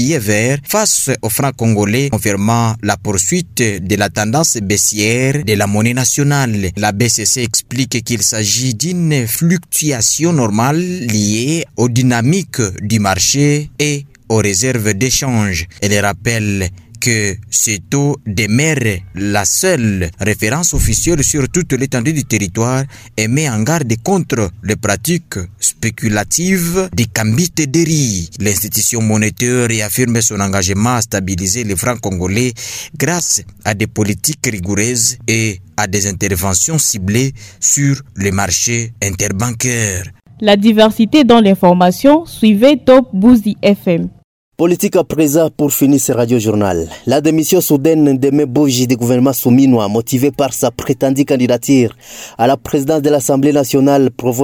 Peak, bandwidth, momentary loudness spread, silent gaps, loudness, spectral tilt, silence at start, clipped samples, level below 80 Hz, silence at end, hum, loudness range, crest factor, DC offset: 0 dBFS; over 20 kHz; 7 LU; 44.24-44.52 s; -13 LUFS; -4.5 dB/octave; 0 s; under 0.1%; -36 dBFS; 0 s; none; 4 LU; 14 dB; under 0.1%